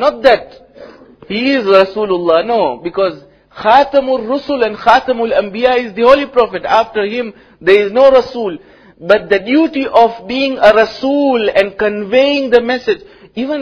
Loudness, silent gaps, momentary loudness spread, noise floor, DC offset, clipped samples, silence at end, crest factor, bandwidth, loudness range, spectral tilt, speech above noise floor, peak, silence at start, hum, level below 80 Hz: -12 LUFS; none; 10 LU; -37 dBFS; under 0.1%; 0.8%; 0 s; 12 dB; 5.4 kHz; 2 LU; -5.5 dB/octave; 25 dB; 0 dBFS; 0 s; none; -46 dBFS